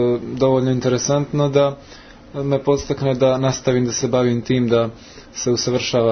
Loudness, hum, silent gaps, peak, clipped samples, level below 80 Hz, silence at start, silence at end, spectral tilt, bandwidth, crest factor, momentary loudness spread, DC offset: -19 LUFS; none; none; -4 dBFS; under 0.1%; -46 dBFS; 0 s; 0 s; -5.5 dB/octave; 6.6 kHz; 16 dB; 7 LU; under 0.1%